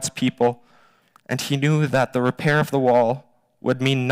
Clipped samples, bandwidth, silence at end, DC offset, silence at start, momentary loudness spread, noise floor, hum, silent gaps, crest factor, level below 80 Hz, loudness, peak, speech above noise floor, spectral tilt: under 0.1%; 16 kHz; 0 s; under 0.1%; 0 s; 11 LU; -56 dBFS; none; none; 12 dB; -58 dBFS; -21 LUFS; -8 dBFS; 36 dB; -5.5 dB/octave